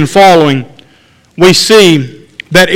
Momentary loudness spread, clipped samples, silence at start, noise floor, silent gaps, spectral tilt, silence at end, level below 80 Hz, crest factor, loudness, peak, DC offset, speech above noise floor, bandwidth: 10 LU; 4%; 0 s; -45 dBFS; none; -4 dB/octave; 0 s; -40 dBFS; 8 dB; -6 LUFS; 0 dBFS; under 0.1%; 39 dB; 17 kHz